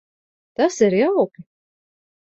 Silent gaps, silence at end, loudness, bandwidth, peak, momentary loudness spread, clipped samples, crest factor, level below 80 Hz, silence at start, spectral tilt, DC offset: none; 0.8 s; -19 LUFS; 8 kHz; -4 dBFS; 8 LU; under 0.1%; 18 dB; -66 dBFS; 0.6 s; -5.5 dB/octave; under 0.1%